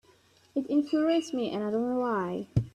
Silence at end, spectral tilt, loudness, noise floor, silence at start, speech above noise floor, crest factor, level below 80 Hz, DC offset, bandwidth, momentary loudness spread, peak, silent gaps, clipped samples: 0.05 s; -7 dB/octave; -29 LUFS; -62 dBFS; 0.55 s; 34 dB; 18 dB; -56 dBFS; under 0.1%; 11 kHz; 6 LU; -12 dBFS; none; under 0.1%